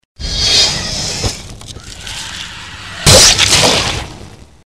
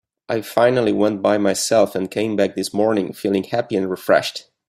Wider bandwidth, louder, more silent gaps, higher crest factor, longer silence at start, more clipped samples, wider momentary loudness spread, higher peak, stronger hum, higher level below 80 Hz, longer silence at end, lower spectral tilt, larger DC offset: first, over 20 kHz vs 16 kHz; first, -9 LUFS vs -19 LUFS; neither; about the same, 14 dB vs 16 dB; about the same, 0.2 s vs 0.3 s; first, 0.2% vs under 0.1%; first, 23 LU vs 6 LU; about the same, 0 dBFS vs -2 dBFS; neither; first, -28 dBFS vs -62 dBFS; about the same, 0.25 s vs 0.25 s; second, -1.5 dB/octave vs -4.5 dB/octave; first, 0.5% vs under 0.1%